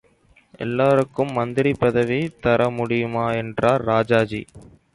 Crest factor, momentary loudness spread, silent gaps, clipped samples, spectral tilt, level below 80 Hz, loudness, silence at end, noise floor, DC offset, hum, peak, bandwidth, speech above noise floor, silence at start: 16 dB; 6 LU; none; under 0.1%; -7.5 dB/octave; -50 dBFS; -20 LUFS; 0.3 s; -57 dBFS; under 0.1%; none; -4 dBFS; 11.5 kHz; 37 dB; 0.6 s